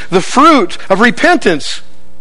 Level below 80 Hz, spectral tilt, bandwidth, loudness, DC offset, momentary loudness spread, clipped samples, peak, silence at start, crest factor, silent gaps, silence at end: -42 dBFS; -4 dB/octave; 11 kHz; -9 LUFS; 10%; 12 LU; 1%; 0 dBFS; 0 s; 12 dB; none; 0.4 s